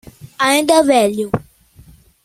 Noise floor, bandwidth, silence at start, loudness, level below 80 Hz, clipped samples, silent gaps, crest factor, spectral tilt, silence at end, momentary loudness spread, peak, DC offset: -46 dBFS; 16 kHz; 0.25 s; -14 LUFS; -50 dBFS; under 0.1%; none; 16 dB; -3.5 dB/octave; 0.85 s; 11 LU; 0 dBFS; under 0.1%